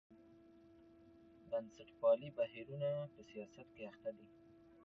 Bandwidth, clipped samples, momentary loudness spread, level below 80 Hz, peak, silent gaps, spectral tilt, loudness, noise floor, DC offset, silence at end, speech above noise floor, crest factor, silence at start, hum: 6.4 kHz; under 0.1%; 21 LU; -80 dBFS; -24 dBFS; none; -6 dB/octave; -42 LUFS; -64 dBFS; under 0.1%; 0.6 s; 22 dB; 20 dB; 0.1 s; none